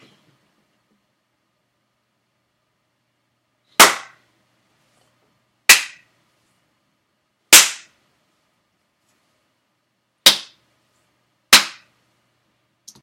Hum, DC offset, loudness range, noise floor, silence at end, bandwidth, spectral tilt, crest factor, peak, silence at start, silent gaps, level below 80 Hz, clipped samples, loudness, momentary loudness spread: none; under 0.1%; 6 LU; -70 dBFS; 1.35 s; 16.5 kHz; 1.5 dB/octave; 22 dB; 0 dBFS; 3.8 s; none; -60 dBFS; 0.1%; -12 LUFS; 20 LU